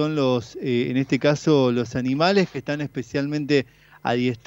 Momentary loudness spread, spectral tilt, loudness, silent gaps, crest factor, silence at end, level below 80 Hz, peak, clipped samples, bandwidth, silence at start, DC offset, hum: 9 LU; -6.5 dB/octave; -22 LUFS; none; 18 dB; 0.1 s; -58 dBFS; -4 dBFS; under 0.1%; 15.5 kHz; 0 s; under 0.1%; none